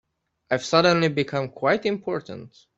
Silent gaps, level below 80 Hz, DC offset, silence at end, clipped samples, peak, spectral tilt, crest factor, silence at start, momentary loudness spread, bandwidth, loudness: none; -62 dBFS; under 0.1%; 0.3 s; under 0.1%; -4 dBFS; -5 dB/octave; 20 dB; 0.5 s; 13 LU; 8 kHz; -23 LUFS